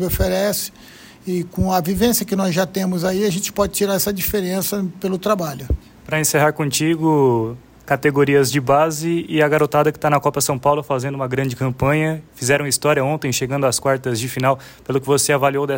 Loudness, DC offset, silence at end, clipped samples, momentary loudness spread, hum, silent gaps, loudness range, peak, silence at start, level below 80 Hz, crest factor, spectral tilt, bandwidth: -18 LUFS; under 0.1%; 0 s; under 0.1%; 8 LU; none; none; 3 LU; -4 dBFS; 0 s; -38 dBFS; 16 dB; -4.5 dB/octave; 16.5 kHz